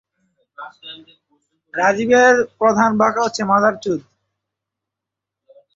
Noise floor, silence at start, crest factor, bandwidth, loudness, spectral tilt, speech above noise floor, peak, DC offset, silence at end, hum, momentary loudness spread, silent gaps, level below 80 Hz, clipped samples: -84 dBFS; 0.6 s; 18 dB; 7.8 kHz; -16 LUFS; -4.5 dB/octave; 67 dB; -2 dBFS; under 0.1%; 1.75 s; none; 24 LU; none; -62 dBFS; under 0.1%